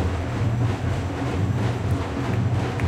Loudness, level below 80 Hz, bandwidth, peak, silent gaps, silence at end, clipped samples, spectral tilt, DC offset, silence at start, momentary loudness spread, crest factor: -25 LUFS; -38 dBFS; 10.5 kHz; -10 dBFS; none; 0 s; under 0.1%; -7.5 dB/octave; under 0.1%; 0 s; 3 LU; 12 dB